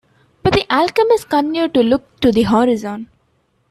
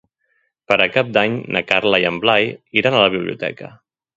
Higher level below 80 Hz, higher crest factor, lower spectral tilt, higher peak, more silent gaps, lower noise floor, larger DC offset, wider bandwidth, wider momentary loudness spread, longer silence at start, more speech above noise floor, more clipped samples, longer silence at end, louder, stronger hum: first, -42 dBFS vs -56 dBFS; about the same, 14 dB vs 18 dB; about the same, -6 dB/octave vs -5.5 dB/octave; about the same, -2 dBFS vs 0 dBFS; neither; second, -62 dBFS vs -67 dBFS; neither; first, 14 kHz vs 7.8 kHz; second, 7 LU vs 10 LU; second, 0.45 s vs 0.7 s; about the same, 47 dB vs 49 dB; neither; first, 0.65 s vs 0.5 s; about the same, -15 LUFS vs -17 LUFS; neither